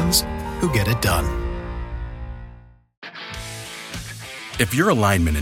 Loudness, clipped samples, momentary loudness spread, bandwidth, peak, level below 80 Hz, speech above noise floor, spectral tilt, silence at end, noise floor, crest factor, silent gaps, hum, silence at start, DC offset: -23 LUFS; under 0.1%; 18 LU; 17 kHz; -2 dBFS; -32 dBFS; 26 dB; -4.5 dB/octave; 0 s; -45 dBFS; 20 dB; 2.97-3.02 s; none; 0 s; under 0.1%